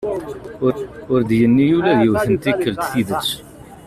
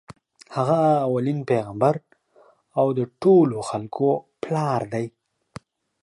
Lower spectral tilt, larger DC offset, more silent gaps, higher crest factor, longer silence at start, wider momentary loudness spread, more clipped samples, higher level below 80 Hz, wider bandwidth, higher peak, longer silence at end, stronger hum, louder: second, -6 dB/octave vs -8 dB/octave; neither; neither; about the same, 14 dB vs 16 dB; second, 0 s vs 0.5 s; about the same, 12 LU vs 12 LU; neither; first, -46 dBFS vs -64 dBFS; first, 14.5 kHz vs 11.5 kHz; about the same, -4 dBFS vs -6 dBFS; second, 0.05 s vs 0.95 s; neither; first, -17 LUFS vs -22 LUFS